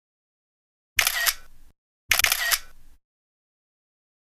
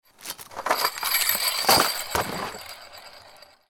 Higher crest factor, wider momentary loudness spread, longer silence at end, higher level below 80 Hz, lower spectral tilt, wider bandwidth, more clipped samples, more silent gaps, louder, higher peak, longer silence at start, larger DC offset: first, 28 dB vs 22 dB; second, 6 LU vs 21 LU; first, 1.4 s vs 0.3 s; first, -48 dBFS vs -54 dBFS; second, 2 dB/octave vs -1 dB/octave; second, 16 kHz vs 19 kHz; neither; first, 1.78-2.09 s vs none; about the same, -22 LUFS vs -22 LUFS; first, 0 dBFS vs -4 dBFS; first, 0.95 s vs 0.2 s; neither